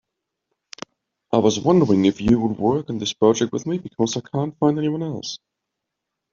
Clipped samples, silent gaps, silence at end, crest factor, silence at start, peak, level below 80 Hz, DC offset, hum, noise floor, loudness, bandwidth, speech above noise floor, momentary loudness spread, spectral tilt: under 0.1%; none; 0.95 s; 18 dB; 1.3 s; -2 dBFS; -52 dBFS; under 0.1%; none; -82 dBFS; -20 LUFS; 7.6 kHz; 62 dB; 16 LU; -6 dB/octave